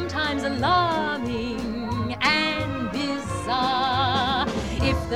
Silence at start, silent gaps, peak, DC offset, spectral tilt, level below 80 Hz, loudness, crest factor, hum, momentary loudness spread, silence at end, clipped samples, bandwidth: 0 s; none; -6 dBFS; 0.3%; -5 dB/octave; -40 dBFS; -24 LUFS; 18 dB; none; 7 LU; 0 s; under 0.1%; 16.5 kHz